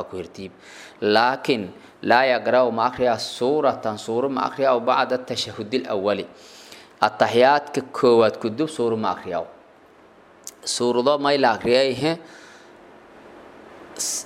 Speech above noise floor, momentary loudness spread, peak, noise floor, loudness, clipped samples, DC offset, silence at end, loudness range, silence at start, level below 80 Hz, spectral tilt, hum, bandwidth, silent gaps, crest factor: 30 dB; 19 LU; -2 dBFS; -51 dBFS; -21 LUFS; under 0.1%; under 0.1%; 0 s; 3 LU; 0 s; -62 dBFS; -3.5 dB/octave; none; 16 kHz; none; 20 dB